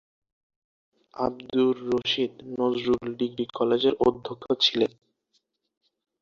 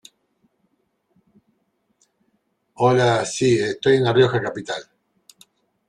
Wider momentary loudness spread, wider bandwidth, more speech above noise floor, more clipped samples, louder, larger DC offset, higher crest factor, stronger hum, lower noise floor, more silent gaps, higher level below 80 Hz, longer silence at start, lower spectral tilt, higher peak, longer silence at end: second, 8 LU vs 13 LU; second, 7.4 kHz vs 11 kHz; about the same, 48 dB vs 51 dB; neither; second, -26 LUFS vs -19 LUFS; neither; about the same, 20 dB vs 20 dB; neither; first, -73 dBFS vs -69 dBFS; neither; about the same, -60 dBFS vs -60 dBFS; second, 1.15 s vs 2.8 s; about the same, -5 dB/octave vs -5.5 dB/octave; second, -8 dBFS vs -4 dBFS; first, 1.35 s vs 1.05 s